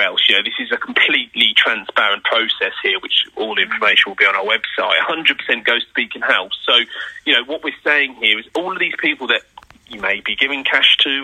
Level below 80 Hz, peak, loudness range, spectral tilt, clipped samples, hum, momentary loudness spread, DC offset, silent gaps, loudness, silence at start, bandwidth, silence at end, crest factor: -62 dBFS; 0 dBFS; 3 LU; -2 dB/octave; under 0.1%; none; 8 LU; under 0.1%; none; -15 LUFS; 0 s; 15.5 kHz; 0 s; 18 dB